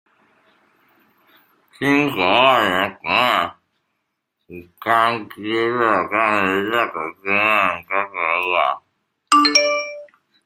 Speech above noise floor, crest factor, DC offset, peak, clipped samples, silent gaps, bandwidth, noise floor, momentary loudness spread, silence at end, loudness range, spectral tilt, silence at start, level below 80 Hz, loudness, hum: 57 dB; 20 dB; under 0.1%; 0 dBFS; under 0.1%; none; 16.5 kHz; -75 dBFS; 10 LU; 0.4 s; 3 LU; -3 dB/octave; 1.8 s; -64 dBFS; -18 LUFS; none